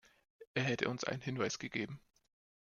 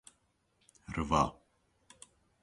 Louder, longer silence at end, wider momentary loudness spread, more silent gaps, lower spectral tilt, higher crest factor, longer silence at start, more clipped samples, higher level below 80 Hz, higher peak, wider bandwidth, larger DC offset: second, -38 LUFS vs -33 LUFS; second, 0.75 s vs 1.1 s; second, 8 LU vs 26 LU; first, 0.47-0.55 s vs none; about the same, -4.5 dB/octave vs -5.5 dB/octave; about the same, 24 dB vs 24 dB; second, 0.4 s vs 0.9 s; neither; second, -74 dBFS vs -52 dBFS; about the same, -16 dBFS vs -14 dBFS; second, 7.4 kHz vs 11.5 kHz; neither